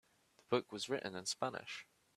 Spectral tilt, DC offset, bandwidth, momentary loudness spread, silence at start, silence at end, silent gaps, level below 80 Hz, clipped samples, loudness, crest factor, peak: -3 dB/octave; under 0.1%; 14 kHz; 9 LU; 0.5 s; 0.35 s; none; -82 dBFS; under 0.1%; -41 LUFS; 24 dB; -20 dBFS